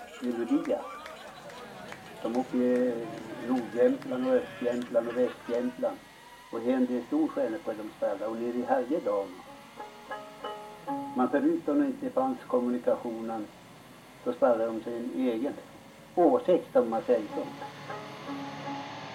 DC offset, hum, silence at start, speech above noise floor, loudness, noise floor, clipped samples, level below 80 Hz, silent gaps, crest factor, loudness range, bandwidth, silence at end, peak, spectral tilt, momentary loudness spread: under 0.1%; none; 0 s; 22 dB; -30 LUFS; -51 dBFS; under 0.1%; -70 dBFS; none; 20 dB; 4 LU; 16 kHz; 0 s; -10 dBFS; -6 dB/octave; 18 LU